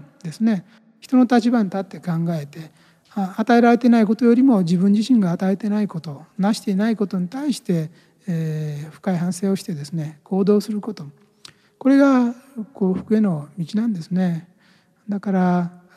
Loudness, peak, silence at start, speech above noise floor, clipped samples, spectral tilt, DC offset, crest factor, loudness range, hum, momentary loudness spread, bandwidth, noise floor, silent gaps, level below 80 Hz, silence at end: -20 LUFS; -4 dBFS; 0.25 s; 38 dB; under 0.1%; -7.5 dB/octave; under 0.1%; 16 dB; 7 LU; none; 14 LU; 13.5 kHz; -57 dBFS; none; -70 dBFS; 0.25 s